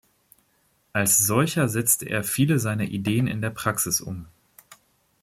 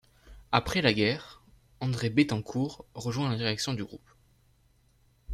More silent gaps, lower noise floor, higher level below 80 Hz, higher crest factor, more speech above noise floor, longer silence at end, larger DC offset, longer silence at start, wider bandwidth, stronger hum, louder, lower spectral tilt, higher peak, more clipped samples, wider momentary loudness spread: neither; about the same, -66 dBFS vs -65 dBFS; about the same, -58 dBFS vs -54 dBFS; about the same, 20 dB vs 24 dB; first, 43 dB vs 36 dB; first, 0.5 s vs 0 s; neither; first, 0.95 s vs 0.25 s; first, 16.5 kHz vs 14.5 kHz; neither; first, -22 LUFS vs -29 LUFS; second, -4 dB/octave vs -5.5 dB/octave; about the same, -6 dBFS vs -8 dBFS; neither; second, 8 LU vs 12 LU